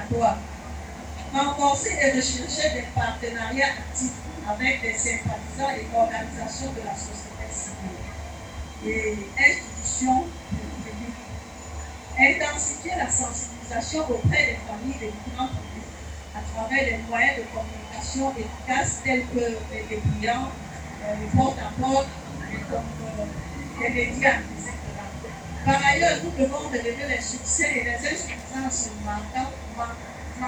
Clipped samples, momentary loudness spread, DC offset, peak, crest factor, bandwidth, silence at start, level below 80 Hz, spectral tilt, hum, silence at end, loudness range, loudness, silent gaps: under 0.1%; 15 LU; under 0.1%; -4 dBFS; 22 dB; over 20 kHz; 0 s; -40 dBFS; -3.5 dB/octave; none; 0 s; 4 LU; -25 LUFS; none